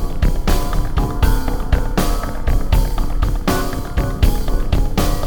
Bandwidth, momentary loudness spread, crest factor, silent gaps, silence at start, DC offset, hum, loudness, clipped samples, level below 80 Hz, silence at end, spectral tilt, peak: over 20 kHz; 4 LU; 14 dB; none; 0 s; under 0.1%; none; -20 LUFS; under 0.1%; -16 dBFS; 0 s; -5.5 dB/octave; 0 dBFS